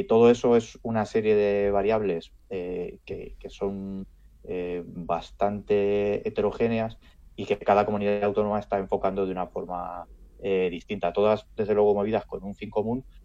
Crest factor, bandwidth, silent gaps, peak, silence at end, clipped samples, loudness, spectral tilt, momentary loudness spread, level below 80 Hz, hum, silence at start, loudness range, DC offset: 18 dB; 7.8 kHz; none; -8 dBFS; 0.05 s; under 0.1%; -26 LUFS; -7 dB/octave; 14 LU; -50 dBFS; none; 0 s; 5 LU; under 0.1%